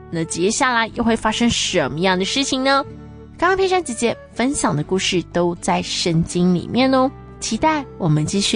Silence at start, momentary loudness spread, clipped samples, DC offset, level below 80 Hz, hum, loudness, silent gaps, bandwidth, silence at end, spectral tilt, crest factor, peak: 0 s; 5 LU; under 0.1%; under 0.1%; -42 dBFS; none; -19 LUFS; none; 10.5 kHz; 0 s; -4 dB/octave; 14 dB; -4 dBFS